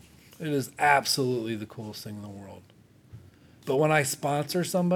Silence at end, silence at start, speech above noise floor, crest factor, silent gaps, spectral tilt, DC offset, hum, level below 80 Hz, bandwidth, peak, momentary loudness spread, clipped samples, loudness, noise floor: 0 s; 0.4 s; 26 dB; 22 dB; none; -4.5 dB/octave; under 0.1%; none; -70 dBFS; 18.5 kHz; -8 dBFS; 19 LU; under 0.1%; -26 LUFS; -53 dBFS